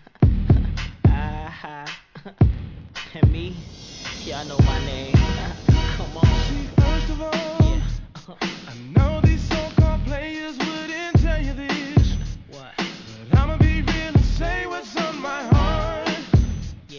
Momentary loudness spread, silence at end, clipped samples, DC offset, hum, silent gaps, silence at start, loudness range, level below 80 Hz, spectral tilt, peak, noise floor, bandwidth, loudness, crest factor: 15 LU; 0 s; under 0.1%; under 0.1%; none; none; 0.2 s; 3 LU; -26 dBFS; -6.5 dB/octave; -4 dBFS; -40 dBFS; 7.4 kHz; -22 LUFS; 16 dB